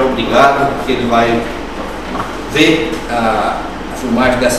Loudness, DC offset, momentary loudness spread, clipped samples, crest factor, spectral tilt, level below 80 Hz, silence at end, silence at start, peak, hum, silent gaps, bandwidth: -14 LUFS; 2%; 12 LU; under 0.1%; 14 dB; -4.5 dB/octave; -32 dBFS; 0 s; 0 s; 0 dBFS; none; none; 15 kHz